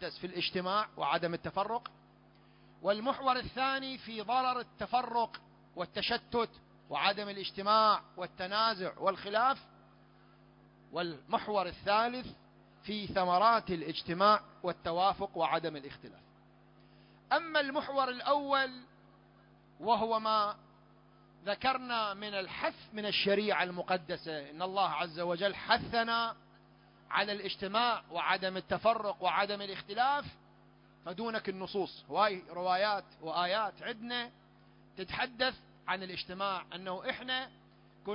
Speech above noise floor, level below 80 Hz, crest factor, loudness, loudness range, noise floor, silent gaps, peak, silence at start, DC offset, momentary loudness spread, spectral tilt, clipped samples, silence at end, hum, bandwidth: 28 dB; -66 dBFS; 22 dB; -33 LUFS; 4 LU; -62 dBFS; none; -12 dBFS; 0 s; under 0.1%; 11 LU; -7.5 dB/octave; under 0.1%; 0 s; none; 5.6 kHz